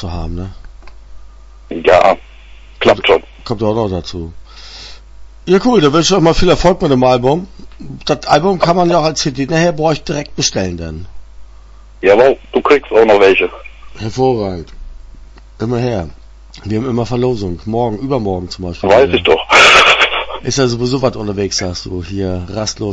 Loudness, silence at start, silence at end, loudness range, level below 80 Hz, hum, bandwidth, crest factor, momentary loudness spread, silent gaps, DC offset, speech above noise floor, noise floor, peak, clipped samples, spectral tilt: -12 LUFS; 0 s; 0 s; 8 LU; -32 dBFS; none; 11 kHz; 14 dB; 17 LU; none; under 0.1%; 24 dB; -37 dBFS; 0 dBFS; 0.1%; -4.5 dB/octave